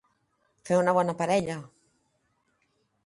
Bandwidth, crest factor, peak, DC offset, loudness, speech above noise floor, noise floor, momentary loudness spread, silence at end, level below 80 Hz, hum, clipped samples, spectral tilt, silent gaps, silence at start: 11.5 kHz; 20 dB; -10 dBFS; under 0.1%; -26 LUFS; 48 dB; -73 dBFS; 12 LU; 1.4 s; -68 dBFS; none; under 0.1%; -6 dB/octave; none; 0.65 s